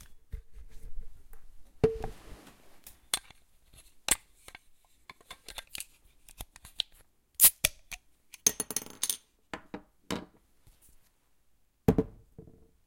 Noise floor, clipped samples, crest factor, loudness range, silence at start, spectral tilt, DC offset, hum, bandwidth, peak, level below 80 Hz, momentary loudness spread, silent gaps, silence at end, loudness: -67 dBFS; under 0.1%; 32 dB; 10 LU; 0 s; -2.5 dB/octave; under 0.1%; none; 17 kHz; -4 dBFS; -50 dBFS; 22 LU; none; 0.35 s; -29 LUFS